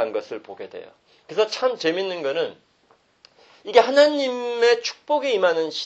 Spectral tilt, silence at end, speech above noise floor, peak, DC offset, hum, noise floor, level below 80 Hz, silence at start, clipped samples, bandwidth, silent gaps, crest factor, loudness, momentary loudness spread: -3 dB/octave; 0 s; 39 dB; 0 dBFS; under 0.1%; none; -61 dBFS; -74 dBFS; 0 s; under 0.1%; 8.4 kHz; none; 22 dB; -21 LUFS; 19 LU